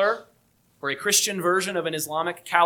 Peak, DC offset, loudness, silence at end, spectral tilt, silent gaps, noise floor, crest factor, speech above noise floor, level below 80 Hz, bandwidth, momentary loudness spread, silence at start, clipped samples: -4 dBFS; under 0.1%; -24 LUFS; 0 s; -2 dB/octave; none; -63 dBFS; 22 dB; 39 dB; -74 dBFS; 19 kHz; 10 LU; 0 s; under 0.1%